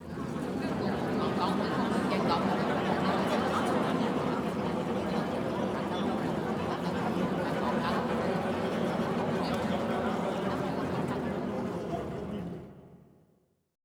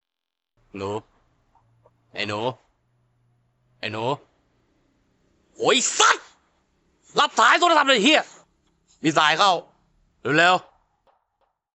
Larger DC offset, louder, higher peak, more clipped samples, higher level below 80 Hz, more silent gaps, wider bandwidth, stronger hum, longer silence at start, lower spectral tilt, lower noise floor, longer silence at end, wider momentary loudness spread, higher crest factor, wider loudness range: neither; second, -31 LUFS vs -20 LUFS; second, -14 dBFS vs -2 dBFS; neither; first, -56 dBFS vs -70 dBFS; neither; first, 17.5 kHz vs 9 kHz; neither; second, 0 s vs 0.75 s; first, -6.5 dB/octave vs -2 dB/octave; second, -70 dBFS vs -85 dBFS; second, 0.9 s vs 1.15 s; second, 6 LU vs 17 LU; second, 16 dB vs 22 dB; second, 4 LU vs 15 LU